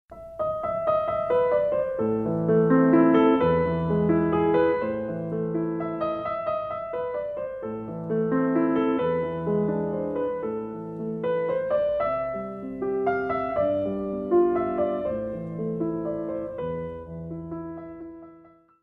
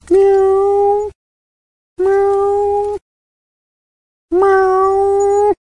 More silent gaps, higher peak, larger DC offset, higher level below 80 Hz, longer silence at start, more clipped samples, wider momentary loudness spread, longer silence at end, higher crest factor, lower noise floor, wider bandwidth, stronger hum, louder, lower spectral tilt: second, none vs 1.15-1.96 s, 3.02-4.28 s; second, -8 dBFS vs -2 dBFS; second, under 0.1% vs 0.2%; second, -52 dBFS vs -46 dBFS; about the same, 0.1 s vs 0.1 s; neither; first, 12 LU vs 8 LU; first, 0.4 s vs 0.2 s; about the same, 16 dB vs 12 dB; second, -53 dBFS vs under -90 dBFS; second, 4.6 kHz vs 9.6 kHz; neither; second, -25 LUFS vs -13 LUFS; first, -10.5 dB/octave vs -6 dB/octave